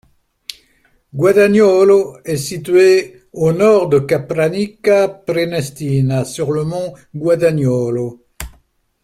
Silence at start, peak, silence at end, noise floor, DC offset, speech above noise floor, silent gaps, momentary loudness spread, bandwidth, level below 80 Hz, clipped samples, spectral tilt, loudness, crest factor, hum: 1.15 s; -2 dBFS; 0.55 s; -57 dBFS; under 0.1%; 43 dB; none; 21 LU; 15 kHz; -46 dBFS; under 0.1%; -6.5 dB/octave; -14 LUFS; 14 dB; none